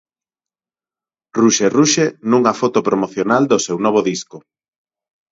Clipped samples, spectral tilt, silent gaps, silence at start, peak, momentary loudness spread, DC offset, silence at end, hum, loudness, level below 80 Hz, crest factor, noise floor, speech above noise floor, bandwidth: under 0.1%; -4 dB/octave; none; 1.35 s; 0 dBFS; 8 LU; under 0.1%; 0.95 s; none; -15 LUFS; -62 dBFS; 18 dB; under -90 dBFS; over 75 dB; 8 kHz